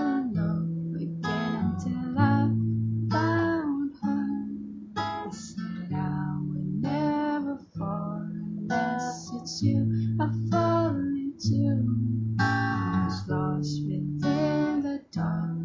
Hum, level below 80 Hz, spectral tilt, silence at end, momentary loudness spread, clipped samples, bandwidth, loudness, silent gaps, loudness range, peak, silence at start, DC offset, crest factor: none; -52 dBFS; -7 dB/octave; 0 s; 9 LU; under 0.1%; 7.6 kHz; -28 LUFS; none; 4 LU; -10 dBFS; 0 s; under 0.1%; 16 dB